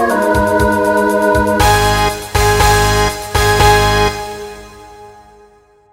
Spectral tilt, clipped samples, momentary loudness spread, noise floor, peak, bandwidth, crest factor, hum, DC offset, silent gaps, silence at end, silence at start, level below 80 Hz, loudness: -4 dB/octave; under 0.1%; 7 LU; -47 dBFS; 0 dBFS; 16.5 kHz; 14 dB; none; under 0.1%; none; 0.8 s; 0 s; -24 dBFS; -12 LUFS